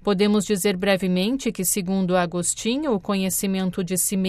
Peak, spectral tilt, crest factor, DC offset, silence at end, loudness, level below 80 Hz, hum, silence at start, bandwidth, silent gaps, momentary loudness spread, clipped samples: -8 dBFS; -4.5 dB/octave; 14 dB; under 0.1%; 0 s; -22 LUFS; -50 dBFS; none; 0.05 s; 15.5 kHz; none; 4 LU; under 0.1%